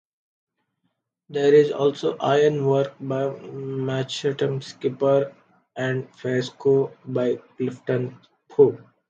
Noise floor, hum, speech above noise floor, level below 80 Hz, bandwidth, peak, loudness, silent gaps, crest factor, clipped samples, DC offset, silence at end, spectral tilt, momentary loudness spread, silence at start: -75 dBFS; none; 53 dB; -70 dBFS; 7.6 kHz; -4 dBFS; -23 LUFS; none; 20 dB; under 0.1%; under 0.1%; 0.35 s; -6.5 dB/octave; 11 LU; 1.3 s